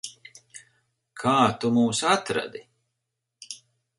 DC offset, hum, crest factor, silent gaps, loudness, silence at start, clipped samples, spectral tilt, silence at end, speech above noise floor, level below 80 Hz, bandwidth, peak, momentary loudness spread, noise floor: under 0.1%; none; 22 dB; none; -23 LUFS; 0.05 s; under 0.1%; -4 dB/octave; 0.4 s; 59 dB; -64 dBFS; 11.5 kHz; -6 dBFS; 23 LU; -82 dBFS